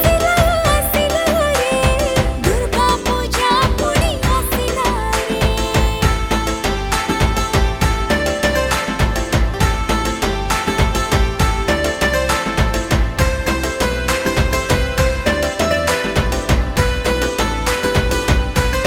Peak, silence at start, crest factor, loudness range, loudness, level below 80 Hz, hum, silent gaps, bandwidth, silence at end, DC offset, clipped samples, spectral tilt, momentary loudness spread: 0 dBFS; 0 s; 16 dB; 2 LU; -17 LUFS; -22 dBFS; none; none; 19 kHz; 0 s; under 0.1%; under 0.1%; -4.5 dB/octave; 3 LU